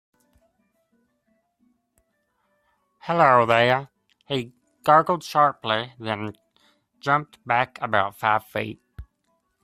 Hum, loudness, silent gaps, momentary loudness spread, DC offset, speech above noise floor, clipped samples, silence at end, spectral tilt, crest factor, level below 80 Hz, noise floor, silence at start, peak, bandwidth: none; -22 LUFS; none; 14 LU; under 0.1%; 50 dB; under 0.1%; 0.6 s; -5.5 dB/octave; 24 dB; -58 dBFS; -71 dBFS; 3.05 s; -2 dBFS; 14.5 kHz